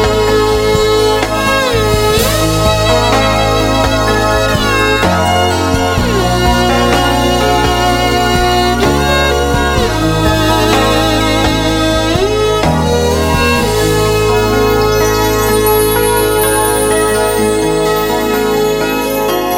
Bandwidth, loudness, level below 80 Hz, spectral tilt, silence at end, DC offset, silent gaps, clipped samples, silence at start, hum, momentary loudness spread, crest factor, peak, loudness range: 16.5 kHz; -11 LUFS; -22 dBFS; -4.5 dB/octave; 0 s; under 0.1%; none; under 0.1%; 0 s; none; 2 LU; 10 dB; 0 dBFS; 1 LU